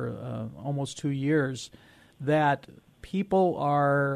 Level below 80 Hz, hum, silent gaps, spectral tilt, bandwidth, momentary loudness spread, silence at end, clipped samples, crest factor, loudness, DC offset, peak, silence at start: -62 dBFS; none; none; -6.5 dB/octave; 11.5 kHz; 12 LU; 0 s; under 0.1%; 14 dB; -28 LUFS; under 0.1%; -14 dBFS; 0 s